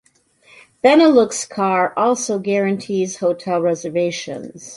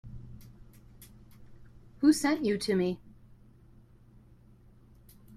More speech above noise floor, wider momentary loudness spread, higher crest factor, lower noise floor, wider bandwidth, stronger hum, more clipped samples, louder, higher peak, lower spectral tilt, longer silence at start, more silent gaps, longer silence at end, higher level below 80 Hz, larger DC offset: first, 37 dB vs 30 dB; second, 10 LU vs 25 LU; second, 16 dB vs 22 dB; about the same, -55 dBFS vs -57 dBFS; second, 11.5 kHz vs 15 kHz; neither; neither; first, -17 LUFS vs -28 LUFS; first, -2 dBFS vs -12 dBFS; about the same, -4.5 dB/octave vs -5 dB/octave; first, 0.85 s vs 0.05 s; neither; second, 0 s vs 2.25 s; second, -64 dBFS vs -58 dBFS; neither